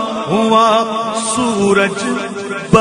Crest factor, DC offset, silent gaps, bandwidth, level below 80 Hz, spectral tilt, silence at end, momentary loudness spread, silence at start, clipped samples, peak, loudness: 14 dB; under 0.1%; none; 12 kHz; -46 dBFS; -4.5 dB/octave; 0 s; 9 LU; 0 s; 0.2%; 0 dBFS; -14 LUFS